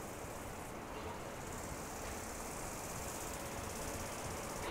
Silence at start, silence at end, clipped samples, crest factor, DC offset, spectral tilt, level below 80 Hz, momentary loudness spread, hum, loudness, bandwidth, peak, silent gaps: 0 s; 0 s; under 0.1%; 14 dB; under 0.1%; -3.5 dB/octave; -56 dBFS; 4 LU; none; -44 LUFS; 16 kHz; -30 dBFS; none